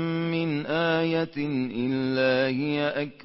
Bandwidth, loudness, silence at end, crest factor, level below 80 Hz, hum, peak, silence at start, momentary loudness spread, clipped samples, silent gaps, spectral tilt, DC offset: 5.8 kHz; -26 LUFS; 0 s; 14 dB; -62 dBFS; none; -12 dBFS; 0 s; 5 LU; under 0.1%; none; -10 dB/octave; under 0.1%